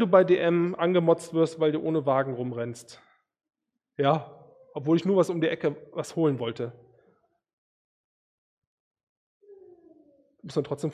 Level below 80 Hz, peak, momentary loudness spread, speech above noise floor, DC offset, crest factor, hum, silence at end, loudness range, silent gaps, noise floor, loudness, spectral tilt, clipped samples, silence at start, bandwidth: -72 dBFS; -4 dBFS; 14 LU; 42 dB; under 0.1%; 24 dB; none; 0 s; 12 LU; 7.53-8.91 s, 9.03-9.40 s; -67 dBFS; -26 LUFS; -7 dB/octave; under 0.1%; 0 s; 12.5 kHz